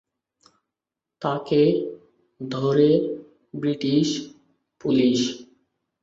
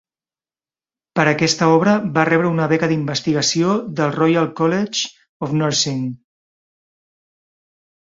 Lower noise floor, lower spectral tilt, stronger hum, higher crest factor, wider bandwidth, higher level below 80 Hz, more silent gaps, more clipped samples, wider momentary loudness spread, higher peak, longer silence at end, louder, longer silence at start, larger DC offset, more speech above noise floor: about the same, -87 dBFS vs under -90 dBFS; first, -6 dB/octave vs -4.5 dB/octave; neither; about the same, 18 dB vs 18 dB; about the same, 7.8 kHz vs 7.8 kHz; second, -64 dBFS vs -58 dBFS; second, none vs 5.29-5.40 s; neither; first, 18 LU vs 8 LU; second, -6 dBFS vs -2 dBFS; second, 0.6 s vs 1.85 s; second, -22 LUFS vs -17 LUFS; about the same, 1.2 s vs 1.15 s; neither; second, 66 dB vs over 73 dB